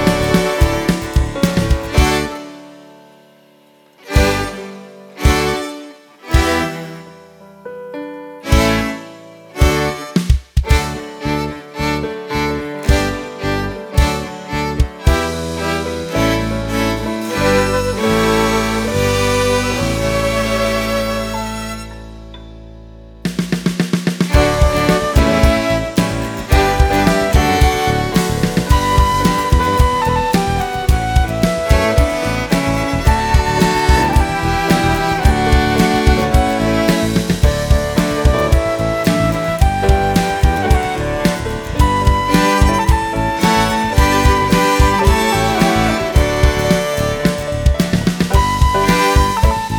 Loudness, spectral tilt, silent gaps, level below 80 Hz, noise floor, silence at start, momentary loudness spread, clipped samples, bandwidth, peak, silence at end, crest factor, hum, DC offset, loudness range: -15 LUFS; -5.5 dB/octave; none; -20 dBFS; -49 dBFS; 0 s; 9 LU; under 0.1%; 19.5 kHz; 0 dBFS; 0 s; 14 dB; none; under 0.1%; 6 LU